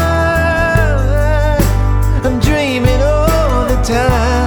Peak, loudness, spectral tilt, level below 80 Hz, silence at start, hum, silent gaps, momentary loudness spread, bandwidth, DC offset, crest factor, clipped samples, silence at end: 0 dBFS; -13 LUFS; -6 dB/octave; -16 dBFS; 0 s; 50 Hz at -25 dBFS; none; 2 LU; over 20 kHz; under 0.1%; 12 dB; under 0.1%; 0 s